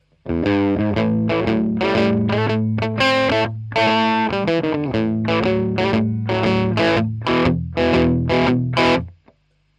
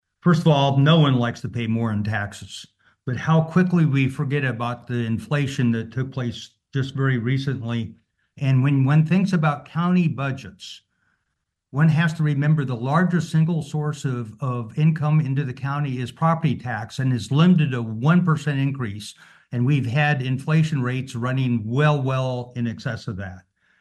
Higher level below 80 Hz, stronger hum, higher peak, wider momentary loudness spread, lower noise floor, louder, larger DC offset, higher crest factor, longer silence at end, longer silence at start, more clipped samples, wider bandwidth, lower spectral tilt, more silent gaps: first, -40 dBFS vs -60 dBFS; neither; about the same, -2 dBFS vs -4 dBFS; second, 4 LU vs 12 LU; second, -57 dBFS vs -77 dBFS; first, -18 LUFS vs -22 LUFS; neither; about the same, 16 dB vs 18 dB; first, 0.65 s vs 0.4 s; about the same, 0.25 s vs 0.25 s; neither; second, 9 kHz vs 10 kHz; about the same, -7 dB/octave vs -7.5 dB/octave; neither